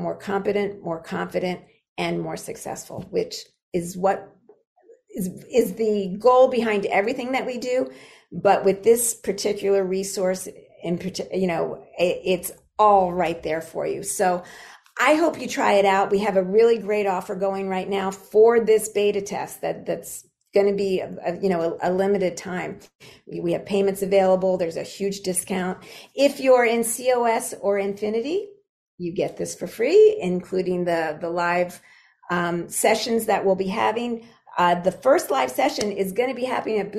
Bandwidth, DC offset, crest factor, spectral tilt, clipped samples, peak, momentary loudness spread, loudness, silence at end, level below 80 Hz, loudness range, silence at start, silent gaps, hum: 14.5 kHz; under 0.1%; 18 dB; -4.5 dB/octave; under 0.1%; -4 dBFS; 13 LU; -22 LUFS; 0 s; -60 dBFS; 5 LU; 0 s; 1.88-1.96 s, 3.63-3.72 s, 4.67-4.76 s, 22.95-22.99 s, 28.69-28.98 s; none